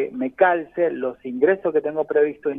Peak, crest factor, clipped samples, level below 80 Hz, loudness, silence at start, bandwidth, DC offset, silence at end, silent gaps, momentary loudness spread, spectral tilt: -4 dBFS; 18 dB; under 0.1%; -66 dBFS; -21 LUFS; 0 s; 3.7 kHz; under 0.1%; 0 s; none; 7 LU; -9 dB/octave